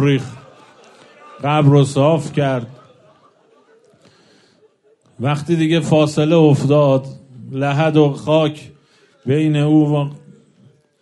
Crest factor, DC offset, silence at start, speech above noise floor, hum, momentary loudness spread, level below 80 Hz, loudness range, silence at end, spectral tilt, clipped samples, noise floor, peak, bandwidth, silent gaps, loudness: 16 dB; under 0.1%; 0 s; 41 dB; none; 15 LU; -60 dBFS; 8 LU; 0.85 s; -7.5 dB/octave; under 0.1%; -56 dBFS; -2 dBFS; 11 kHz; none; -16 LUFS